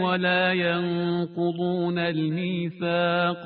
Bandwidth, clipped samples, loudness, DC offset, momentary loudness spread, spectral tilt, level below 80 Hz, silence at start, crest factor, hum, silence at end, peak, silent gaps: 4.7 kHz; under 0.1%; -25 LUFS; under 0.1%; 6 LU; -10.5 dB/octave; -64 dBFS; 0 s; 16 dB; none; 0 s; -10 dBFS; none